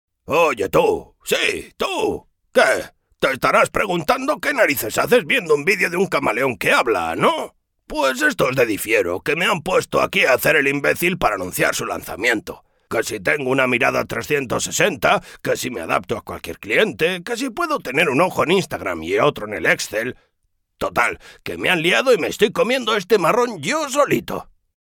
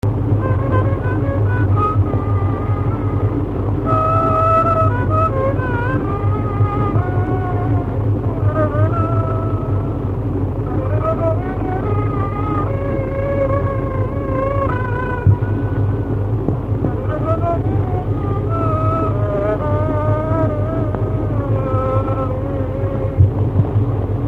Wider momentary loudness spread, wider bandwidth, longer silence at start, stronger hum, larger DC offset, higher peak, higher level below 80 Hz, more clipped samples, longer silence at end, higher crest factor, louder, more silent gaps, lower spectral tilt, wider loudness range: first, 8 LU vs 5 LU; first, 19 kHz vs 3.8 kHz; first, 0.3 s vs 0.05 s; neither; neither; about the same, -2 dBFS vs 0 dBFS; second, -48 dBFS vs -28 dBFS; neither; first, 0.5 s vs 0 s; about the same, 16 dB vs 16 dB; about the same, -19 LUFS vs -18 LUFS; neither; second, -3.5 dB/octave vs -10.5 dB/octave; about the same, 3 LU vs 3 LU